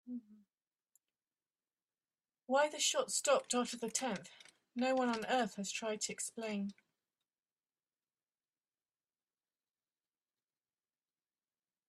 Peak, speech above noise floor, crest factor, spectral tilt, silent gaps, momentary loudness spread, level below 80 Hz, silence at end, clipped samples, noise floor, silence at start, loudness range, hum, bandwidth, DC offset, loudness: -20 dBFS; over 53 dB; 22 dB; -2.5 dB/octave; 0.67-0.71 s; 13 LU; -86 dBFS; 5.15 s; under 0.1%; under -90 dBFS; 0.05 s; 10 LU; none; 13.5 kHz; under 0.1%; -36 LUFS